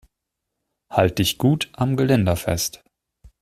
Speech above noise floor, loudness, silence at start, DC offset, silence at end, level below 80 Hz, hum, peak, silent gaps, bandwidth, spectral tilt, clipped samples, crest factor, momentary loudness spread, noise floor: 61 dB; -21 LUFS; 0.9 s; under 0.1%; 0.65 s; -46 dBFS; none; -2 dBFS; none; 16 kHz; -5 dB/octave; under 0.1%; 20 dB; 6 LU; -81 dBFS